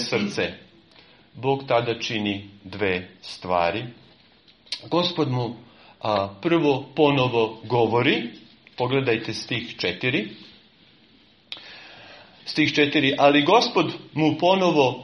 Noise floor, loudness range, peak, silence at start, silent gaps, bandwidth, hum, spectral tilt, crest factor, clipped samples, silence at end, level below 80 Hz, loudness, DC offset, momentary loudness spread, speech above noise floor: -56 dBFS; 6 LU; -4 dBFS; 0 s; none; 10 kHz; none; -5.5 dB/octave; 20 dB; under 0.1%; 0 s; -62 dBFS; -22 LUFS; under 0.1%; 19 LU; 34 dB